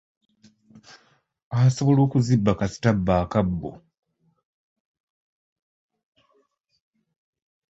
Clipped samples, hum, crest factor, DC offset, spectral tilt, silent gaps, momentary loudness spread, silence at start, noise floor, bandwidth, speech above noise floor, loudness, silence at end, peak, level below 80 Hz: under 0.1%; none; 20 dB; under 0.1%; -7.5 dB/octave; none; 10 LU; 1.5 s; -68 dBFS; 8 kHz; 47 dB; -22 LUFS; 4 s; -4 dBFS; -46 dBFS